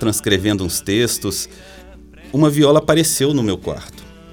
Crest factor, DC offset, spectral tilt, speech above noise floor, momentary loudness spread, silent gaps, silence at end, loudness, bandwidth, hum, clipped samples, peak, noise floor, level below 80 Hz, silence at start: 16 dB; under 0.1%; -4.5 dB/octave; 23 dB; 14 LU; none; 0 s; -16 LUFS; over 20 kHz; none; under 0.1%; 0 dBFS; -40 dBFS; -42 dBFS; 0 s